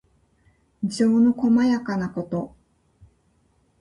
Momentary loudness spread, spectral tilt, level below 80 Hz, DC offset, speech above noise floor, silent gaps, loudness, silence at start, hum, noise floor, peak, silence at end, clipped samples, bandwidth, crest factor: 12 LU; -6.5 dB/octave; -58 dBFS; under 0.1%; 43 dB; none; -22 LUFS; 0.8 s; none; -64 dBFS; -10 dBFS; 1.35 s; under 0.1%; 11 kHz; 14 dB